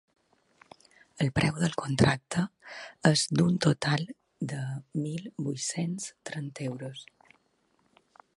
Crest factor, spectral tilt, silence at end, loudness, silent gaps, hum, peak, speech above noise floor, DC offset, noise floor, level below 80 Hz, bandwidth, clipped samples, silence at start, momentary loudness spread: 24 dB; -5 dB/octave; 1.35 s; -29 LUFS; none; none; -6 dBFS; 42 dB; under 0.1%; -71 dBFS; -56 dBFS; 11.5 kHz; under 0.1%; 1.15 s; 14 LU